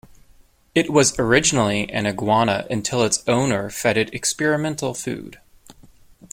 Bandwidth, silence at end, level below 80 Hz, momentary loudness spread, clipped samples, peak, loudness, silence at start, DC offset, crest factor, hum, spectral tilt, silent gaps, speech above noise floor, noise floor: 16.5 kHz; 0.6 s; -48 dBFS; 9 LU; under 0.1%; -2 dBFS; -20 LUFS; 0.75 s; under 0.1%; 20 dB; none; -3.5 dB/octave; none; 33 dB; -53 dBFS